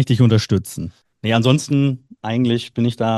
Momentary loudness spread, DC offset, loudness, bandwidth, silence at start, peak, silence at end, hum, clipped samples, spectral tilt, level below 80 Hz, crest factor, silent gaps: 14 LU; under 0.1%; -18 LUFS; 12.5 kHz; 0 s; 0 dBFS; 0 s; none; under 0.1%; -6.5 dB/octave; -54 dBFS; 16 dB; none